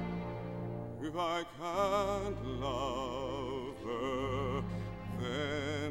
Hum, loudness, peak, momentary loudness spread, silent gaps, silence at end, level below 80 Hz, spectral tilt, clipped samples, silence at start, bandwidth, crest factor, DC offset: none; -37 LUFS; -20 dBFS; 8 LU; none; 0 s; -52 dBFS; -6 dB/octave; under 0.1%; 0 s; 16.5 kHz; 16 dB; under 0.1%